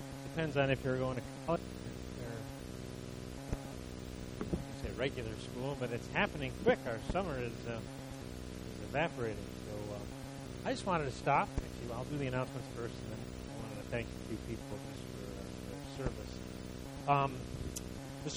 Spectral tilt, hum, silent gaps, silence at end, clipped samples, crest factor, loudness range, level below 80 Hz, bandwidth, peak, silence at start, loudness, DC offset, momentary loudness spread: -5.5 dB/octave; none; none; 0 s; under 0.1%; 24 dB; 6 LU; -52 dBFS; over 20 kHz; -16 dBFS; 0 s; -39 LUFS; under 0.1%; 13 LU